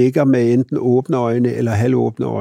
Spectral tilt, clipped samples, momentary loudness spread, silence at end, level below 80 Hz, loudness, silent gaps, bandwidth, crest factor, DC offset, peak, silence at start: -8.5 dB/octave; under 0.1%; 4 LU; 0 s; -58 dBFS; -16 LUFS; none; 12.5 kHz; 14 dB; under 0.1%; -2 dBFS; 0 s